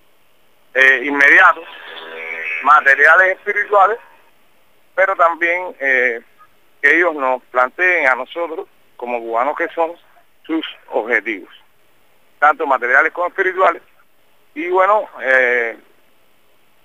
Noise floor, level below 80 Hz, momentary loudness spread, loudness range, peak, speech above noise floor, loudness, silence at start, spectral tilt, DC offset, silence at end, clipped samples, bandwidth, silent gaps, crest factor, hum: -58 dBFS; -70 dBFS; 17 LU; 9 LU; 0 dBFS; 43 dB; -14 LUFS; 0.75 s; -2.5 dB/octave; 0.3%; 1.1 s; under 0.1%; 15.5 kHz; none; 16 dB; none